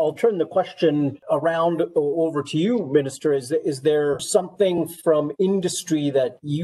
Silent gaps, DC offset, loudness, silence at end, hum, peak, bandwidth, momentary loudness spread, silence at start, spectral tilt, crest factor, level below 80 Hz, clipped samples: none; under 0.1%; -22 LUFS; 0 s; none; -6 dBFS; 12.5 kHz; 3 LU; 0 s; -5.5 dB/octave; 16 dB; -68 dBFS; under 0.1%